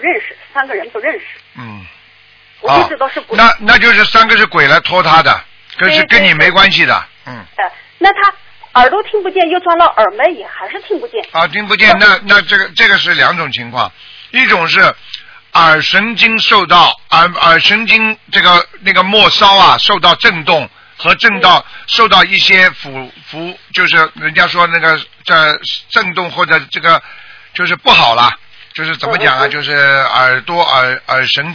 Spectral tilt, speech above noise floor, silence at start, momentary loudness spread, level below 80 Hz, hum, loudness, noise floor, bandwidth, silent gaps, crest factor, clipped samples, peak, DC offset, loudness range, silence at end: -3.5 dB/octave; 34 dB; 0 s; 14 LU; -42 dBFS; none; -8 LUFS; -44 dBFS; 5.4 kHz; none; 10 dB; 2%; 0 dBFS; under 0.1%; 4 LU; 0 s